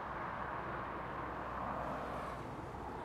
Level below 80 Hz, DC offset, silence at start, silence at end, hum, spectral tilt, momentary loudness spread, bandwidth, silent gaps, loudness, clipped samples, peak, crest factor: -56 dBFS; under 0.1%; 0 s; 0 s; none; -6.5 dB/octave; 4 LU; 16 kHz; none; -43 LUFS; under 0.1%; -28 dBFS; 14 dB